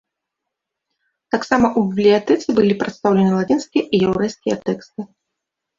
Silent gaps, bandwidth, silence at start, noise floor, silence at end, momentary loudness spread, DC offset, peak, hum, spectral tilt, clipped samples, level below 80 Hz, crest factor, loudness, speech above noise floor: none; 7.6 kHz; 1.35 s; -81 dBFS; 0.75 s; 10 LU; under 0.1%; -2 dBFS; none; -6.5 dB/octave; under 0.1%; -52 dBFS; 18 dB; -18 LUFS; 64 dB